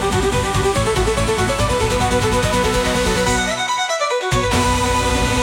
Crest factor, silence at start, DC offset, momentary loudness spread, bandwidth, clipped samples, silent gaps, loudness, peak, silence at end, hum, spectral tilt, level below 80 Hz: 12 dB; 0 s; under 0.1%; 2 LU; 17 kHz; under 0.1%; none; -17 LUFS; -4 dBFS; 0 s; none; -4 dB/octave; -26 dBFS